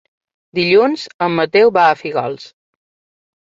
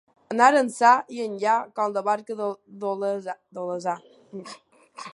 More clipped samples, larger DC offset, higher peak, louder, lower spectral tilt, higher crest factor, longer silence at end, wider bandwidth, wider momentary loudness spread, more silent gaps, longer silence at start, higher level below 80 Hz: neither; neither; about the same, -2 dBFS vs -4 dBFS; first, -14 LUFS vs -24 LUFS; first, -6 dB/octave vs -4 dB/octave; second, 16 dB vs 22 dB; first, 1 s vs 0 s; second, 7.6 kHz vs 11.5 kHz; second, 13 LU vs 21 LU; first, 1.14-1.19 s vs none; first, 0.55 s vs 0.3 s; first, -62 dBFS vs -80 dBFS